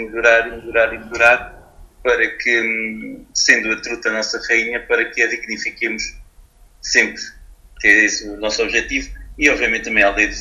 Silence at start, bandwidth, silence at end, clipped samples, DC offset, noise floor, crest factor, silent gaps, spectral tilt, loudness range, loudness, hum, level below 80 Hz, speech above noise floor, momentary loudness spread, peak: 0 s; 14 kHz; 0 s; under 0.1%; under 0.1%; -47 dBFS; 18 dB; none; -1.5 dB/octave; 3 LU; -16 LUFS; none; -40 dBFS; 29 dB; 11 LU; 0 dBFS